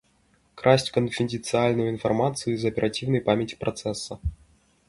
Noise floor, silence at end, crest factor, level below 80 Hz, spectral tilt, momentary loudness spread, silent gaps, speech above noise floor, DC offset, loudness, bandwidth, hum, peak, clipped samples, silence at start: -64 dBFS; 0.55 s; 22 dB; -46 dBFS; -5.5 dB/octave; 10 LU; none; 40 dB; under 0.1%; -25 LUFS; 11.5 kHz; none; -4 dBFS; under 0.1%; 0.55 s